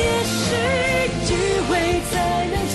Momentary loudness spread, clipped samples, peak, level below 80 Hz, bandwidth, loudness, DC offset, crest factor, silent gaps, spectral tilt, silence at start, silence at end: 2 LU; under 0.1%; -10 dBFS; -34 dBFS; 12.5 kHz; -20 LUFS; under 0.1%; 10 dB; none; -4 dB/octave; 0 s; 0 s